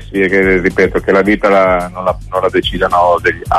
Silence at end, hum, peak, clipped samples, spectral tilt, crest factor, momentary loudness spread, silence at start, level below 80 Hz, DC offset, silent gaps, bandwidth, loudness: 0 s; none; 0 dBFS; under 0.1%; -6 dB/octave; 10 dB; 6 LU; 0 s; -30 dBFS; under 0.1%; none; 13.5 kHz; -12 LUFS